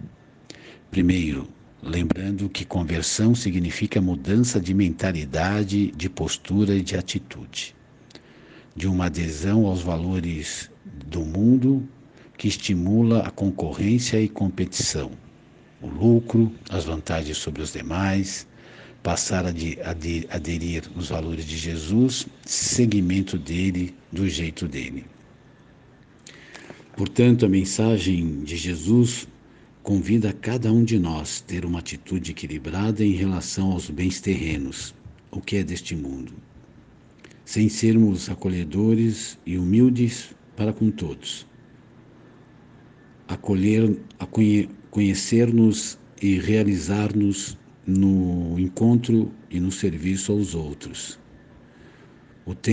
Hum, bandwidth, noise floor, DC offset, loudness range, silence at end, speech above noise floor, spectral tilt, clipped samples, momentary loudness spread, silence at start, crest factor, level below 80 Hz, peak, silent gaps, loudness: none; 10 kHz; -51 dBFS; under 0.1%; 6 LU; 0 s; 29 dB; -5.5 dB/octave; under 0.1%; 14 LU; 0.05 s; 18 dB; -46 dBFS; -4 dBFS; none; -23 LUFS